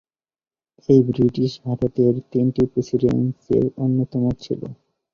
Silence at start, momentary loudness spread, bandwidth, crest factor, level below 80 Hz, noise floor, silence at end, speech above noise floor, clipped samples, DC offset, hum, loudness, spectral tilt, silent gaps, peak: 0.9 s; 11 LU; 7 kHz; 18 dB; -48 dBFS; under -90 dBFS; 0.4 s; over 71 dB; under 0.1%; under 0.1%; none; -20 LUFS; -9.5 dB/octave; none; -2 dBFS